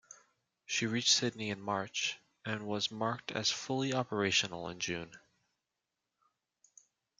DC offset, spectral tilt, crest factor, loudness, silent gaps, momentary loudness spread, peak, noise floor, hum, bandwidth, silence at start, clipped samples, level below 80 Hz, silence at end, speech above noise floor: under 0.1%; -2.5 dB/octave; 22 dB; -34 LUFS; none; 11 LU; -16 dBFS; -88 dBFS; none; 12 kHz; 0.1 s; under 0.1%; -76 dBFS; 2 s; 53 dB